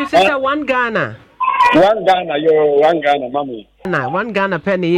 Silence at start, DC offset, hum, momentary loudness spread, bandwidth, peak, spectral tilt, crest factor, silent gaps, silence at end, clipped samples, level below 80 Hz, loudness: 0 s; under 0.1%; none; 10 LU; 13 kHz; -4 dBFS; -6 dB/octave; 10 dB; none; 0 s; under 0.1%; -50 dBFS; -14 LUFS